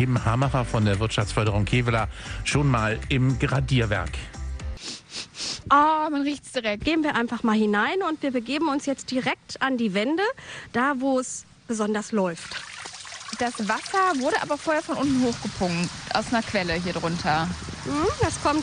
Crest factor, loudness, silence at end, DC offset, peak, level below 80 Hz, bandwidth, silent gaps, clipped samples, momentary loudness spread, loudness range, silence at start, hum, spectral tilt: 18 dB; -25 LUFS; 0 s; under 0.1%; -6 dBFS; -40 dBFS; 10.5 kHz; none; under 0.1%; 12 LU; 3 LU; 0 s; none; -5 dB/octave